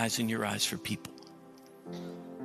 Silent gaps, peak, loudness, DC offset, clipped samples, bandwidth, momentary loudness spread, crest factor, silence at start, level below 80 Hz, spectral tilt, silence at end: none; -14 dBFS; -34 LUFS; under 0.1%; under 0.1%; 14 kHz; 22 LU; 22 dB; 0 s; -72 dBFS; -3 dB/octave; 0 s